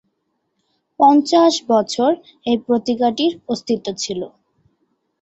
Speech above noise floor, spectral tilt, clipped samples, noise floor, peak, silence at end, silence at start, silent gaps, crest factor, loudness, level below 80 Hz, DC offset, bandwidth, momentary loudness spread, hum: 54 dB; -4 dB/octave; under 0.1%; -71 dBFS; -2 dBFS; 0.95 s; 1 s; none; 16 dB; -17 LUFS; -62 dBFS; under 0.1%; 8.2 kHz; 12 LU; none